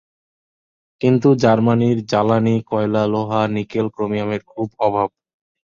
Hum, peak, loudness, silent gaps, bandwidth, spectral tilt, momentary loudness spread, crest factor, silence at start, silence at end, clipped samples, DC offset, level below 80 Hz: none; -2 dBFS; -18 LUFS; none; 7.4 kHz; -8 dB/octave; 8 LU; 16 dB; 1 s; 0.6 s; under 0.1%; under 0.1%; -54 dBFS